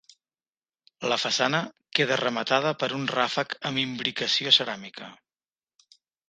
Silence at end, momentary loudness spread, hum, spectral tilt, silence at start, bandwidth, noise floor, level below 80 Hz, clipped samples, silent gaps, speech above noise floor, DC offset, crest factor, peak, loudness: 1.15 s; 13 LU; none; -3 dB/octave; 1 s; 10 kHz; under -90 dBFS; -74 dBFS; under 0.1%; none; over 64 dB; under 0.1%; 26 dB; -2 dBFS; -25 LUFS